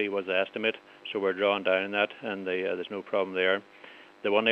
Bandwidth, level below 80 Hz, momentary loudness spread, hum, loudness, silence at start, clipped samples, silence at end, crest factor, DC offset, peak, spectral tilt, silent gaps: 6.6 kHz; -86 dBFS; 10 LU; none; -29 LUFS; 0 s; under 0.1%; 0 s; 22 dB; under 0.1%; -8 dBFS; -6 dB/octave; none